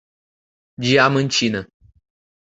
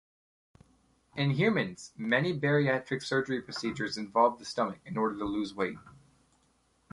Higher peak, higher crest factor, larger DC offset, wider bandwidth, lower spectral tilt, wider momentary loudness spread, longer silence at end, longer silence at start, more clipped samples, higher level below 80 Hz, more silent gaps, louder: first, 0 dBFS vs -12 dBFS; about the same, 22 dB vs 20 dB; neither; second, 8.2 kHz vs 11.5 kHz; second, -4.5 dB/octave vs -6 dB/octave; about the same, 10 LU vs 9 LU; about the same, 0.9 s vs 1 s; second, 0.8 s vs 1.15 s; neither; first, -56 dBFS vs -66 dBFS; neither; first, -18 LUFS vs -30 LUFS